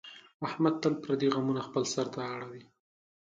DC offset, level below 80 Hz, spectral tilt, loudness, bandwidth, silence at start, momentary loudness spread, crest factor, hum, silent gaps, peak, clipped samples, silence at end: under 0.1%; -74 dBFS; -5.5 dB/octave; -32 LUFS; 9.2 kHz; 0.05 s; 15 LU; 20 dB; none; 0.34-0.40 s; -14 dBFS; under 0.1%; 0.6 s